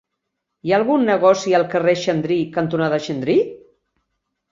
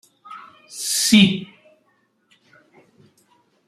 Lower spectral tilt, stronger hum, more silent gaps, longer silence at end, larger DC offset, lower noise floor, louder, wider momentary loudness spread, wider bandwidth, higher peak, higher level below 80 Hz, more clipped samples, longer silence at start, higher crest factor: first, -6 dB/octave vs -3 dB/octave; neither; neither; second, 0.95 s vs 2.25 s; neither; first, -78 dBFS vs -65 dBFS; about the same, -18 LUFS vs -17 LUFS; second, 6 LU vs 27 LU; second, 7.6 kHz vs 15 kHz; about the same, -2 dBFS vs -2 dBFS; about the same, -62 dBFS vs -60 dBFS; neither; first, 0.65 s vs 0.3 s; about the same, 18 dB vs 22 dB